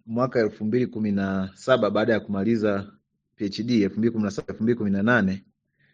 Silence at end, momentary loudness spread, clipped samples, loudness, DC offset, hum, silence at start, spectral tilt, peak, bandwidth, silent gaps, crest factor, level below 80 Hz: 0.55 s; 8 LU; under 0.1%; -24 LUFS; under 0.1%; none; 0.05 s; -7 dB/octave; -4 dBFS; 7.6 kHz; none; 20 dB; -62 dBFS